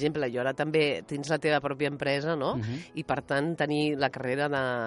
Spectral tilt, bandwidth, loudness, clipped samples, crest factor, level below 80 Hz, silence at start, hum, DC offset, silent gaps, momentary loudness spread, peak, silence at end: -6 dB/octave; 11.5 kHz; -29 LUFS; under 0.1%; 18 dB; -62 dBFS; 0 s; none; under 0.1%; none; 6 LU; -12 dBFS; 0 s